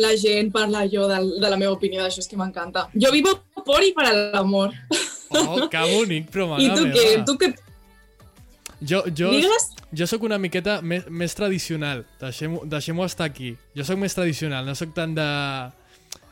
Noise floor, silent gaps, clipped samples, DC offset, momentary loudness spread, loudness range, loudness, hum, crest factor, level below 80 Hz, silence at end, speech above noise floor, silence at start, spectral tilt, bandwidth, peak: -51 dBFS; none; under 0.1%; under 0.1%; 12 LU; 7 LU; -21 LUFS; none; 14 dB; -52 dBFS; 0.6 s; 30 dB; 0 s; -4 dB/octave; 16.5 kHz; -8 dBFS